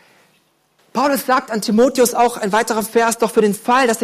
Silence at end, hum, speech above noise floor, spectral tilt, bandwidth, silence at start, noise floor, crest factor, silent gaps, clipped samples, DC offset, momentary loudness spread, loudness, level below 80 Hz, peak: 0 s; none; 44 dB; -4 dB/octave; 15.5 kHz; 0.95 s; -59 dBFS; 12 dB; none; under 0.1%; under 0.1%; 4 LU; -16 LUFS; -58 dBFS; -4 dBFS